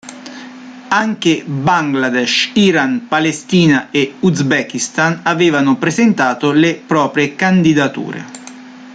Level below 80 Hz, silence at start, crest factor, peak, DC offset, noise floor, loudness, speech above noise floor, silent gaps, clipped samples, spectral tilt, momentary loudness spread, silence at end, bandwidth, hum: -54 dBFS; 0.05 s; 14 dB; 0 dBFS; under 0.1%; -34 dBFS; -13 LUFS; 21 dB; none; under 0.1%; -5 dB/octave; 18 LU; 0 s; 9.4 kHz; none